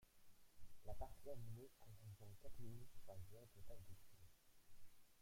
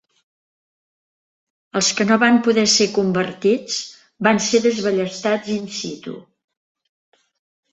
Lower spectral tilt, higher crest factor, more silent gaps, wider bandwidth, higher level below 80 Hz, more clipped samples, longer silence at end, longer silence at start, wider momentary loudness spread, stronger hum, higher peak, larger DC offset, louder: first, -6 dB/octave vs -3.5 dB/octave; about the same, 16 dB vs 20 dB; neither; first, 16.5 kHz vs 8.2 kHz; about the same, -66 dBFS vs -62 dBFS; neither; second, 0 s vs 1.5 s; second, 0 s vs 1.75 s; second, 8 LU vs 14 LU; neither; second, -38 dBFS vs -2 dBFS; neither; second, -61 LUFS vs -18 LUFS